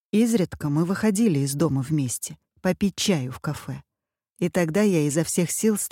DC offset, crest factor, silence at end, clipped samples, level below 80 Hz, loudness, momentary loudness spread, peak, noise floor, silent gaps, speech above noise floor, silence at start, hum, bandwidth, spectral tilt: under 0.1%; 16 dB; 0.05 s; under 0.1%; -56 dBFS; -24 LUFS; 10 LU; -8 dBFS; -82 dBFS; 4.32-4.36 s; 59 dB; 0.15 s; none; 17 kHz; -5.5 dB/octave